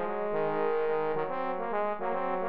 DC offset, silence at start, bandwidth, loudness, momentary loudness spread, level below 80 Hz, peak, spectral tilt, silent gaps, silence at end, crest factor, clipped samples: 1%; 0 s; 5.2 kHz; -31 LUFS; 3 LU; -66 dBFS; -18 dBFS; -4.5 dB/octave; none; 0 s; 12 dB; under 0.1%